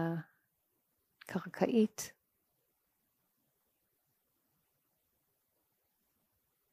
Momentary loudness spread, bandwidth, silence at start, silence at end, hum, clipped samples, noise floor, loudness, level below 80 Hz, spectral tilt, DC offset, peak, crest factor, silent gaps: 14 LU; 15.5 kHz; 0 s; 4.6 s; none; under 0.1%; -81 dBFS; -36 LUFS; -86 dBFS; -6 dB/octave; under 0.1%; -16 dBFS; 26 dB; none